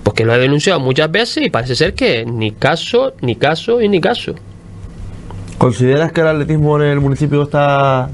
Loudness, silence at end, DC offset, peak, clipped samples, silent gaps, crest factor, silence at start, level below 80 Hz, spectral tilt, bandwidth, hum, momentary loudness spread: -13 LUFS; 0 s; under 0.1%; 0 dBFS; under 0.1%; none; 14 dB; 0 s; -36 dBFS; -6 dB/octave; 11.5 kHz; none; 18 LU